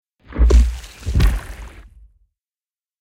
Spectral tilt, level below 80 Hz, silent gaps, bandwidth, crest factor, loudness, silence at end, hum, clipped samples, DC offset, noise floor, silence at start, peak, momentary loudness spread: -6.5 dB/octave; -20 dBFS; none; 11.5 kHz; 18 dB; -19 LUFS; 1.3 s; none; under 0.1%; under 0.1%; under -90 dBFS; 0.3 s; -2 dBFS; 22 LU